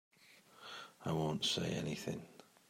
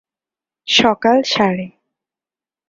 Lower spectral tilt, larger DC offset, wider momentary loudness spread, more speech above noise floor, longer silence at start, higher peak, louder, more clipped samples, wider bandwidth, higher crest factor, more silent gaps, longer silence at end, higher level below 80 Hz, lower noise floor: about the same, -4.5 dB/octave vs -4 dB/octave; neither; about the same, 16 LU vs 18 LU; second, 26 dB vs over 75 dB; second, 0.25 s vs 0.65 s; second, -24 dBFS vs 0 dBFS; second, -39 LUFS vs -15 LUFS; neither; first, 16 kHz vs 7.8 kHz; about the same, 18 dB vs 18 dB; neither; second, 0.25 s vs 1 s; second, -72 dBFS vs -56 dBFS; second, -64 dBFS vs under -90 dBFS